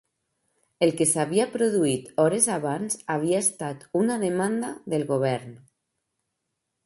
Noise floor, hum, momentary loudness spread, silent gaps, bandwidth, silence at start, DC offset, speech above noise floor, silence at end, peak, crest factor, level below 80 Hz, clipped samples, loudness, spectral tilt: -81 dBFS; none; 8 LU; none; 12 kHz; 0.8 s; under 0.1%; 56 dB; 1.3 s; -4 dBFS; 22 dB; -68 dBFS; under 0.1%; -25 LUFS; -4.5 dB/octave